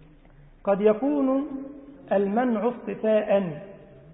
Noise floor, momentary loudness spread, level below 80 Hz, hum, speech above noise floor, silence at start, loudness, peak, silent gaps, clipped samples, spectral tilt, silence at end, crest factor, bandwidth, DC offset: -51 dBFS; 17 LU; -58 dBFS; none; 28 dB; 0.65 s; -25 LUFS; -8 dBFS; none; under 0.1%; -11.5 dB/octave; 0 s; 18 dB; 3.9 kHz; under 0.1%